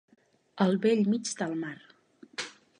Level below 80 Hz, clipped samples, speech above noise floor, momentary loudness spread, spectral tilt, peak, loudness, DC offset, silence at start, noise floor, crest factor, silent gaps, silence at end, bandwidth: -80 dBFS; under 0.1%; 22 dB; 15 LU; -5.5 dB/octave; -10 dBFS; -29 LUFS; under 0.1%; 0.55 s; -50 dBFS; 20 dB; none; 0.3 s; 10.5 kHz